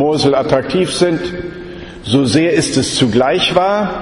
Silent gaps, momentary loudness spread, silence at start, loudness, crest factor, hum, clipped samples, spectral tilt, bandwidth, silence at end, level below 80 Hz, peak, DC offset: none; 14 LU; 0 s; -14 LUFS; 14 dB; none; under 0.1%; -4.5 dB/octave; 11.5 kHz; 0 s; -40 dBFS; 0 dBFS; under 0.1%